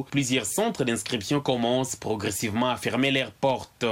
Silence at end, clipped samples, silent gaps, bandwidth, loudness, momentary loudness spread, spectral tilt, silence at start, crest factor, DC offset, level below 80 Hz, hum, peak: 0 s; under 0.1%; none; 17 kHz; -26 LUFS; 4 LU; -4 dB/octave; 0 s; 16 dB; under 0.1%; -60 dBFS; none; -10 dBFS